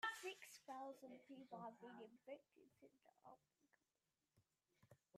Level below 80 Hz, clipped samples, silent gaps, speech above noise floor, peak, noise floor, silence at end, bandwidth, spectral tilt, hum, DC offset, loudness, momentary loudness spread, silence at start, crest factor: under -90 dBFS; under 0.1%; none; over 28 dB; -32 dBFS; under -90 dBFS; 0 s; 13.5 kHz; -3 dB/octave; none; under 0.1%; -57 LUFS; 11 LU; 0 s; 26 dB